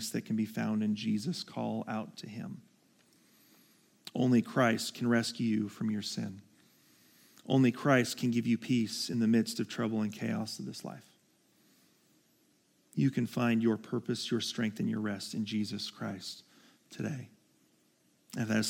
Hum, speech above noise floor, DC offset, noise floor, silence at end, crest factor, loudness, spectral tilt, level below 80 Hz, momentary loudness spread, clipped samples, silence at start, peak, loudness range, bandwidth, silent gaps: none; 38 dB; under 0.1%; -70 dBFS; 0 s; 22 dB; -33 LUFS; -5.5 dB/octave; -82 dBFS; 16 LU; under 0.1%; 0 s; -12 dBFS; 8 LU; 16.5 kHz; none